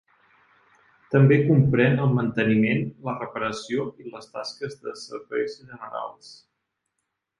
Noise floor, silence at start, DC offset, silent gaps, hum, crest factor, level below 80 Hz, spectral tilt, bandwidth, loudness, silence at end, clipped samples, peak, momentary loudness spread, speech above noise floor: -80 dBFS; 1.1 s; under 0.1%; none; none; 18 dB; -60 dBFS; -7.5 dB/octave; 10.5 kHz; -23 LUFS; 1.05 s; under 0.1%; -6 dBFS; 18 LU; 57 dB